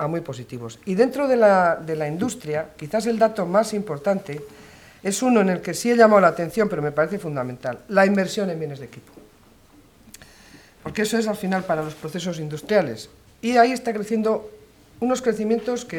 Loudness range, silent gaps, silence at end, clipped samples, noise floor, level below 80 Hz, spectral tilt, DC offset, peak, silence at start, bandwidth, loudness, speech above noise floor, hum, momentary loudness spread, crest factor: 8 LU; none; 0 s; under 0.1%; -52 dBFS; -58 dBFS; -5.5 dB/octave; under 0.1%; -2 dBFS; 0 s; 18 kHz; -22 LUFS; 31 dB; none; 15 LU; 20 dB